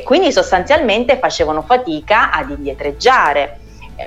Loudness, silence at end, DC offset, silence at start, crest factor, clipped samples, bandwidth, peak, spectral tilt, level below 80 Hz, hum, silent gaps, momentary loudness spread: -14 LUFS; 0 s; under 0.1%; 0 s; 14 dB; under 0.1%; 11.5 kHz; 0 dBFS; -3.5 dB/octave; -36 dBFS; none; none; 9 LU